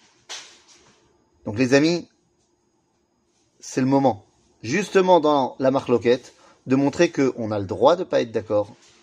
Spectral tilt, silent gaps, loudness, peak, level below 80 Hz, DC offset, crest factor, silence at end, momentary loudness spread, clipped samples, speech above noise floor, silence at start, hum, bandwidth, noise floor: -5.5 dB/octave; none; -21 LUFS; -2 dBFS; -64 dBFS; under 0.1%; 20 dB; 0.3 s; 19 LU; under 0.1%; 47 dB; 0.3 s; none; 10.5 kHz; -67 dBFS